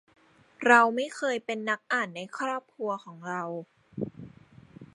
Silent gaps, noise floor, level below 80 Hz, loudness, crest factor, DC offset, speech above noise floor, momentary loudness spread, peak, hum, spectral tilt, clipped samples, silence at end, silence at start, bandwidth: none; -53 dBFS; -70 dBFS; -28 LUFS; 26 dB; under 0.1%; 25 dB; 18 LU; -4 dBFS; none; -4 dB/octave; under 0.1%; 0.1 s; 0.6 s; 11.5 kHz